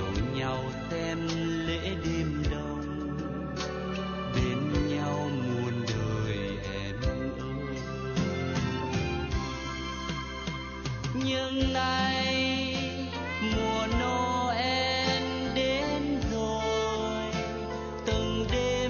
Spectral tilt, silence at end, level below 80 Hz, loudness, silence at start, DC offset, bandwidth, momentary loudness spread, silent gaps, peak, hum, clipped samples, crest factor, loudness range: -5.5 dB/octave; 0 s; -40 dBFS; -30 LUFS; 0 s; under 0.1%; 7 kHz; 8 LU; none; -14 dBFS; none; under 0.1%; 16 dB; 4 LU